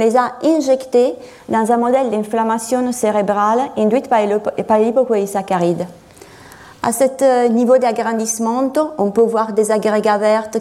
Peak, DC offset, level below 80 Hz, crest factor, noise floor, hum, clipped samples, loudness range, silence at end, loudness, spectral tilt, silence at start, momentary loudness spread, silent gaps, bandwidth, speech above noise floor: -2 dBFS; under 0.1%; -58 dBFS; 14 dB; -40 dBFS; none; under 0.1%; 2 LU; 0 s; -16 LUFS; -5 dB/octave; 0 s; 5 LU; none; 15.5 kHz; 25 dB